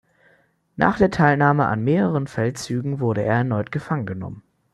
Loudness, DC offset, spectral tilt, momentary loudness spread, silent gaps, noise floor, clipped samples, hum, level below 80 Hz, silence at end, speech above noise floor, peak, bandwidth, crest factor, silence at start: -21 LUFS; under 0.1%; -7.5 dB/octave; 10 LU; none; -60 dBFS; under 0.1%; none; -50 dBFS; 0.35 s; 40 dB; -2 dBFS; 12 kHz; 20 dB; 0.8 s